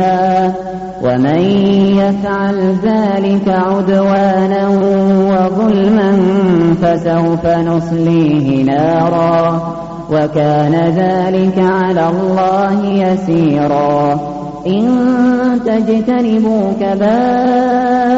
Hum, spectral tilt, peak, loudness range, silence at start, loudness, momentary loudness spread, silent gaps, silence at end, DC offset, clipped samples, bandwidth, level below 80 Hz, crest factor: none; -7 dB/octave; -2 dBFS; 2 LU; 0 s; -12 LUFS; 4 LU; none; 0 s; under 0.1%; under 0.1%; 7.6 kHz; -42 dBFS; 8 dB